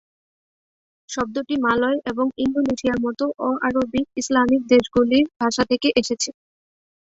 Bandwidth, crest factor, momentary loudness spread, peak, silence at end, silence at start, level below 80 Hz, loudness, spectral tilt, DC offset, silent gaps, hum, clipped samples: 8 kHz; 18 dB; 8 LU; -4 dBFS; 0.8 s; 1.1 s; -52 dBFS; -21 LUFS; -4 dB/octave; under 0.1%; 5.36-5.40 s; none; under 0.1%